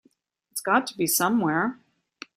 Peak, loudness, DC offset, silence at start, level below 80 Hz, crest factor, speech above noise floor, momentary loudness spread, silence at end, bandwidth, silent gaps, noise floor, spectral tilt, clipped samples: -6 dBFS; -24 LUFS; under 0.1%; 0.55 s; -70 dBFS; 20 dB; 42 dB; 12 LU; 0.65 s; 16 kHz; none; -66 dBFS; -3.5 dB/octave; under 0.1%